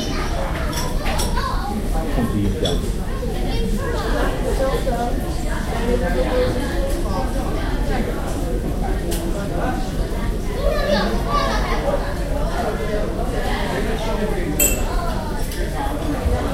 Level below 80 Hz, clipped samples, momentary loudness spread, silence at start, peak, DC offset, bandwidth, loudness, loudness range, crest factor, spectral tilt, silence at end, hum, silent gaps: -24 dBFS; under 0.1%; 5 LU; 0 s; -4 dBFS; under 0.1%; 16 kHz; -22 LUFS; 2 LU; 16 dB; -5 dB/octave; 0 s; none; none